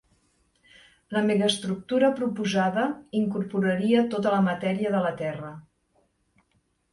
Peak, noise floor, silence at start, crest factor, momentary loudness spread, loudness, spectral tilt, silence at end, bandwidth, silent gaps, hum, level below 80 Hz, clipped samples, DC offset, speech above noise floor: -10 dBFS; -71 dBFS; 1.1 s; 18 dB; 7 LU; -25 LUFS; -6 dB/octave; 1.3 s; 11.5 kHz; none; none; -66 dBFS; under 0.1%; under 0.1%; 46 dB